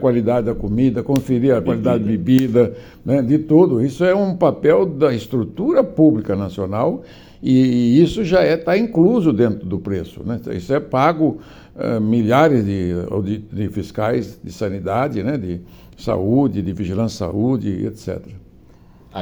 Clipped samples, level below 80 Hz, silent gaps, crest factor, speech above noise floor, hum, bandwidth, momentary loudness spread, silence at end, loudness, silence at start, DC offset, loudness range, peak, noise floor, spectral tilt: under 0.1%; -46 dBFS; none; 16 dB; 29 dB; none; over 20 kHz; 12 LU; 0 s; -18 LUFS; 0 s; under 0.1%; 6 LU; -2 dBFS; -46 dBFS; -8 dB/octave